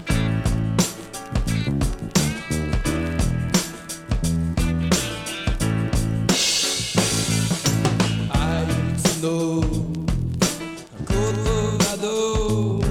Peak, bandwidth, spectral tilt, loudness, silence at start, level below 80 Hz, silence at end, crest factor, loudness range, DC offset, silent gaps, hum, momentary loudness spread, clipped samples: -4 dBFS; 17 kHz; -4.5 dB/octave; -22 LUFS; 0 s; -30 dBFS; 0 s; 18 dB; 3 LU; under 0.1%; none; none; 6 LU; under 0.1%